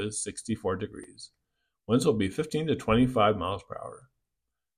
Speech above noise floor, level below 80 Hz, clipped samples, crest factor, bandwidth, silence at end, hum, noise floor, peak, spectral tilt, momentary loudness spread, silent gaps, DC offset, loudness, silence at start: 58 dB; -52 dBFS; under 0.1%; 20 dB; 14.5 kHz; 0.8 s; none; -86 dBFS; -10 dBFS; -5.5 dB/octave; 20 LU; none; under 0.1%; -28 LUFS; 0 s